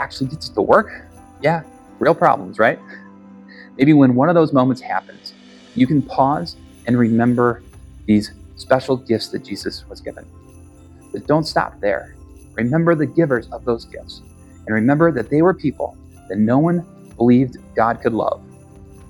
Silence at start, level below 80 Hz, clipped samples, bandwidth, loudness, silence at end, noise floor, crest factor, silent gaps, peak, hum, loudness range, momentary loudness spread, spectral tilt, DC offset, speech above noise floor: 0 s; -46 dBFS; under 0.1%; 18 kHz; -18 LUFS; 0.25 s; -43 dBFS; 18 dB; none; 0 dBFS; none; 6 LU; 19 LU; -7.5 dB/octave; under 0.1%; 26 dB